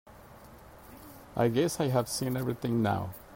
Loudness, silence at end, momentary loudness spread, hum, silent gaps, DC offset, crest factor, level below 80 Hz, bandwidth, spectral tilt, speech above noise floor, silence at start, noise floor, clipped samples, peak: -30 LUFS; 0 s; 22 LU; none; none; under 0.1%; 18 dB; -58 dBFS; 16.5 kHz; -6 dB/octave; 23 dB; 0.1 s; -52 dBFS; under 0.1%; -14 dBFS